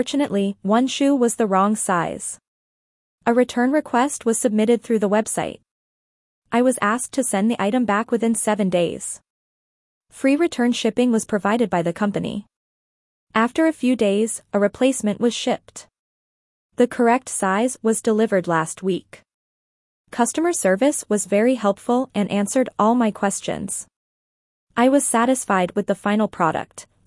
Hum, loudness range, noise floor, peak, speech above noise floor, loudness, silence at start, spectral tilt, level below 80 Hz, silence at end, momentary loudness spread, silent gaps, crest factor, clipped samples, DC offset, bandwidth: none; 2 LU; under -90 dBFS; -4 dBFS; over 70 dB; -20 LUFS; 0 s; -4.5 dB/octave; -62 dBFS; 0.25 s; 8 LU; 2.48-3.18 s, 5.71-6.42 s, 9.30-10.01 s, 12.56-13.27 s, 15.99-16.70 s, 19.34-20.05 s, 23.96-24.67 s; 16 dB; under 0.1%; under 0.1%; 12 kHz